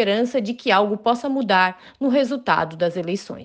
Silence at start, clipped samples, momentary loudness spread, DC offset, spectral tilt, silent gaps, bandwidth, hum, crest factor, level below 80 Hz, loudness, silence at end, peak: 0 s; under 0.1%; 6 LU; under 0.1%; -5.5 dB/octave; none; 9.2 kHz; none; 16 dB; -64 dBFS; -21 LUFS; 0 s; -4 dBFS